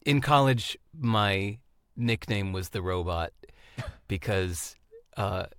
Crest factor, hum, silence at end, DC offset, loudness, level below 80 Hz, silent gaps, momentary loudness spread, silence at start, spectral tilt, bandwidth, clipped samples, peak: 20 dB; none; 0.05 s; under 0.1%; -28 LUFS; -52 dBFS; none; 18 LU; 0.05 s; -5.5 dB/octave; 17.5 kHz; under 0.1%; -8 dBFS